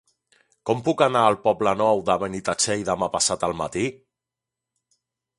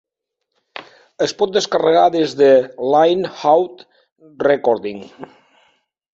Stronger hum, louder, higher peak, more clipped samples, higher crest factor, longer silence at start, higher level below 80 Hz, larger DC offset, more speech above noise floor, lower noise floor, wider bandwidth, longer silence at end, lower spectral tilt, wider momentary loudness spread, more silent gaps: neither; second, -22 LUFS vs -16 LUFS; about the same, -2 dBFS vs -2 dBFS; neither; first, 22 dB vs 16 dB; about the same, 0.65 s vs 0.75 s; first, -56 dBFS vs -62 dBFS; neither; about the same, 65 dB vs 62 dB; first, -87 dBFS vs -77 dBFS; first, 11.5 kHz vs 7.8 kHz; first, 1.45 s vs 0.9 s; about the same, -3.5 dB/octave vs -4.5 dB/octave; second, 8 LU vs 23 LU; second, none vs 4.12-4.16 s